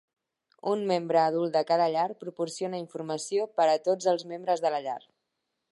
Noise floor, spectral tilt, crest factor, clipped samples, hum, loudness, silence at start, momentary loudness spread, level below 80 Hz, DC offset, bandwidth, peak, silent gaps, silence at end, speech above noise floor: -82 dBFS; -4.5 dB/octave; 18 dB; under 0.1%; none; -28 LUFS; 0.65 s; 10 LU; -84 dBFS; under 0.1%; 11.5 kHz; -12 dBFS; none; 0.75 s; 55 dB